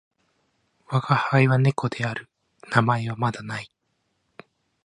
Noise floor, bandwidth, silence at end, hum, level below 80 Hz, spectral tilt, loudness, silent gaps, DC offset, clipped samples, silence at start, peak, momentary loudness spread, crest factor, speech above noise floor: -73 dBFS; 10.5 kHz; 1.2 s; none; -62 dBFS; -7 dB/octave; -23 LUFS; none; under 0.1%; under 0.1%; 0.9 s; -2 dBFS; 15 LU; 22 dB; 51 dB